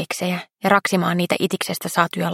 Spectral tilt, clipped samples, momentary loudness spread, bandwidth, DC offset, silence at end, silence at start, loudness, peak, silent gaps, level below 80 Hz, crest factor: -4.5 dB/octave; under 0.1%; 7 LU; 16.5 kHz; under 0.1%; 0 s; 0 s; -20 LUFS; -2 dBFS; none; -66 dBFS; 20 dB